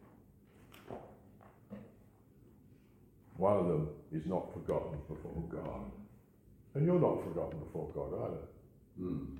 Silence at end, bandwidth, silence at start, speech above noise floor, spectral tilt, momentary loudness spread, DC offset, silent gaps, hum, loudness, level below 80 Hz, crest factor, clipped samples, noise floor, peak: 0 s; 16.5 kHz; 0 s; 27 dB; -10 dB/octave; 24 LU; under 0.1%; none; none; -37 LUFS; -58 dBFS; 22 dB; under 0.1%; -63 dBFS; -18 dBFS